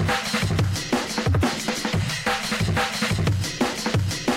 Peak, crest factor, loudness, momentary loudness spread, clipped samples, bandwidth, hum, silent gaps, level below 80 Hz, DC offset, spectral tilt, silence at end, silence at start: -10 dBFS; 14 dB; -23 LUFS; 2 LU; under 0.1%; 16.5 kHz; none; none; -40 dBFS; under 0.1%; -4.5 dB/octave; 0 s; 0 s